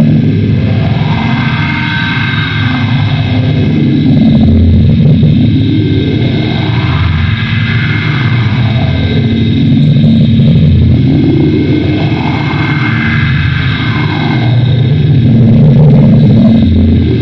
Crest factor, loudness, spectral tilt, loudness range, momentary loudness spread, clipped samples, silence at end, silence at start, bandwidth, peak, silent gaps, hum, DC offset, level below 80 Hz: 8 dB; -8 LUFS; -9 dB/octave; 3 LU; 6 LU; under 0.1%; 0 s; 0 s; 6 kHz; 0 dBFS; none; none; under 0.1%; -28 dBFS